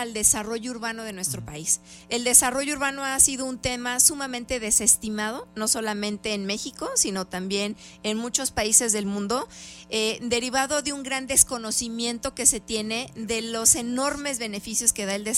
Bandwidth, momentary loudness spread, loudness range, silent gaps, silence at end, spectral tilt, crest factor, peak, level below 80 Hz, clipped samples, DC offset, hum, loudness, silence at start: 16 kHz; 11 LU; 3 LU; none; 0 s; -1.5 dB/octave; 24 dB; -2 dBFS; -50 dBFS; under 0.1%; under 0.1%; none; -23 LUFS; 0 s